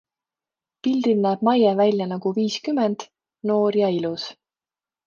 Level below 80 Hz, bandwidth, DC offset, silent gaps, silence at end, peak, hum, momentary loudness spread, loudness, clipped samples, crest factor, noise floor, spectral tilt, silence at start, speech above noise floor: -72 dBFS; 7.4 kHz; under 0.1%; none; 0.75 s; -6 dBFS; none; 11 LU; -22 LUFS; under 0.1%; 18 dB; under -90 dBFS; -6.5 dB/octave; 0.85 s; over 69 dB